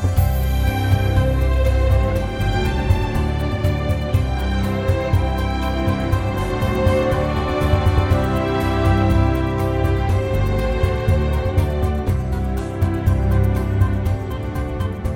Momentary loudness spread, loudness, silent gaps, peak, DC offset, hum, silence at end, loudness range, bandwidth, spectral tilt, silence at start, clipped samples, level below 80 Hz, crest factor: 4 LU; -20 LUFS; none; -2 dBFS; under 0.1%; none; 0 s; 2 LU; 17 kHz; -7.5 dB/octave; 0 s; under 0.1%; -22 dBFS; 16 dB